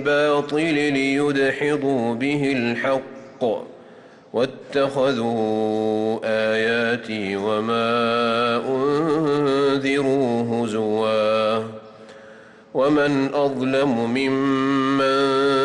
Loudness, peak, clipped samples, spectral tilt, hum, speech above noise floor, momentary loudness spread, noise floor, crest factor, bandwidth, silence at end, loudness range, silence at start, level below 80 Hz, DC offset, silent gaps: -21 LUFS; -10 dBFS; under 0.1%; -6 dB/octave; none; 25 dB; 6 LU; -46 dBFS; 10 dB; 11.5 kHz; 0 s; 3 LU; 0 s; -62 dBFS; under 0.1%; none